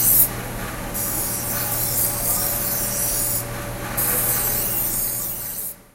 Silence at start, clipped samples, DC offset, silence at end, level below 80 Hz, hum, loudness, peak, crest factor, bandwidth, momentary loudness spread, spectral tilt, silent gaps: 0 s; under 0.1%; under 0.1%; 0.1 s; -38 dBFS; none; -20 LUFS; 0 dBFS; 22 dB; 16 kHz; 10 LU; -2.5 dB/octave; none